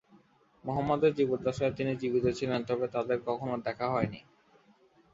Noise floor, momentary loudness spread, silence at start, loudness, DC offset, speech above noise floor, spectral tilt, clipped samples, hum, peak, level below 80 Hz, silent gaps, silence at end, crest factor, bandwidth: -64 dBFS; 8 LU; 0.65 s; -31 LUFS; under 0.1%; 33 dB; -7 dB/octave; under 0.1%; none; -14 dBFS; -60 dBFS; none; 0.95 s; 18 dB; 7.8 kHz